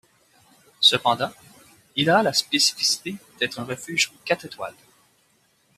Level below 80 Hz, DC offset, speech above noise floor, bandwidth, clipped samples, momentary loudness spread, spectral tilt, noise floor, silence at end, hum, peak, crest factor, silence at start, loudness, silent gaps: -68 dBFS; under 0.1%; 40 dB; 15 kHz; under 0.1%; 15 LU; -2 dB/octave; -64 dBFS; 1.05 s; none; -4 dBFS; 22 dB; 0.8 s; -21 LUFS; none